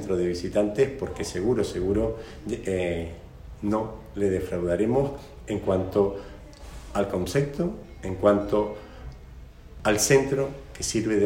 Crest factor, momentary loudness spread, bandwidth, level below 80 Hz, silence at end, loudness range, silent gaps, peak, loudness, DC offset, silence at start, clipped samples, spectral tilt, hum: 20 dB; 18 LU; 17 kHz; -44 dBFS; 0 s; 3 LU; none; -6 dBFS; -26 LUFS; under 0.1%; 0 s; under 0.1%; -5 dB/octave; none